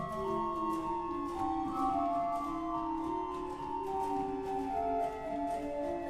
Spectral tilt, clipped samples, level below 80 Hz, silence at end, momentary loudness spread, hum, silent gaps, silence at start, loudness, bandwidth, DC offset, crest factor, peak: -6.5 dB/octave; under 0.1%; -54 dBFS; 0 s; 4 LU; none; none; 0 s; -36 LUFS; 14.5 kHz; under 0.1%; 14 dB; -22 dBFS